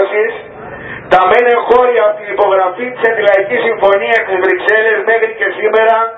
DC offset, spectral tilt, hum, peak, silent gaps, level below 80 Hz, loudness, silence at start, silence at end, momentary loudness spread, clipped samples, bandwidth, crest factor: under 0.1%; -5.5 dB/octave; none; 0 dBFS; none; -50 dBFS; -11 LUFS; 0 s; 0 s; 8 LU; 0.2%; 6.2 kHz; 12 dB